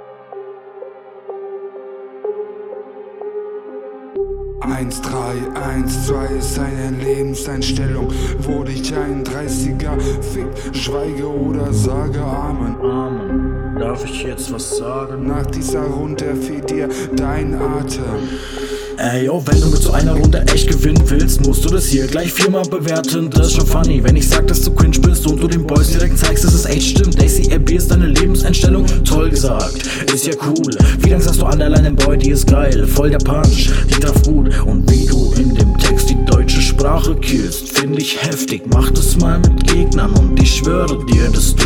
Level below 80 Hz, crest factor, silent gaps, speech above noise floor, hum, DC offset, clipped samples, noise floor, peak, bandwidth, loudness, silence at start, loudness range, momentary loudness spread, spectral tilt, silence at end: -16 dBFS; 12 dB; none; 22 dB; none; under 0.1%; under 0.1%; -34 dBFS; 0 dBFS; 17.5 kHz; -15 LUFS; 0 s; 8 LU; 12 LU; -5 dB/octave; 0 s